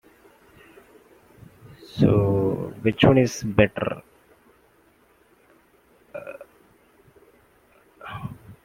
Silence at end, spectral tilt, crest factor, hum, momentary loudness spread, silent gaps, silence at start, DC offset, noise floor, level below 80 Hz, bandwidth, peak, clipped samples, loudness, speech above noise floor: 0.1 s; -6.5 dB/octave; 24 dB; none; 22 LU; none; 1.95 s; under 0.1%; -59 dBFS; -48 dBFS; 16 kHz; -2 dBFS; under 0.1%; -22 LUFS; 40 dB